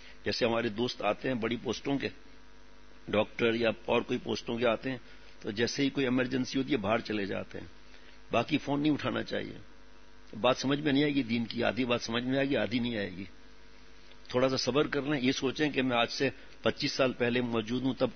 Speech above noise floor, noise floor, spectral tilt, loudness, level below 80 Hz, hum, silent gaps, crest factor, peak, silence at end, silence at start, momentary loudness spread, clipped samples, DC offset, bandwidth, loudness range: 26 dB; -57 dBFS; -5 dB/octave; -31 LUFS; -60 dBFS; none; none; 20 dB; -12 dBFS; 0 s; 0 s; 10 LU; under 0.1%; 0.3%; 6.6 kHz; 3 LU